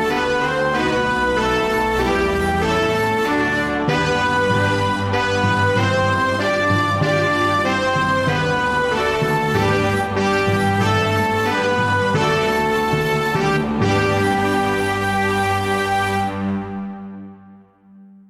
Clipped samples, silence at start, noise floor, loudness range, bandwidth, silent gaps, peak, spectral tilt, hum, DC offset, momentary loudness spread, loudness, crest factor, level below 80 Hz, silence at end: under 0.1%; 0 s; -46 dBFS; 1 LU; 15.5 kHz; none; -4 dBFS; -5.5 dB/octave; none; under 0.1%; 2 LU; -18 LUFS; 14 dB; -40 dBFS; 0.25 s